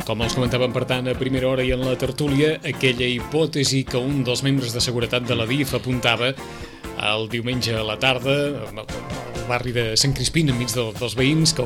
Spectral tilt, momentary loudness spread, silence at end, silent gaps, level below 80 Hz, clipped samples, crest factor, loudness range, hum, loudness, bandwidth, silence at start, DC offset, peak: -4.5 dB/octave; 7 LU; 0 s; none; -40 dBFS; under 0.1%; 18 dB; 2 LU; none; -21 LUFS; 16.5 kHz; 0 s; under 0.1%; -4 dBFS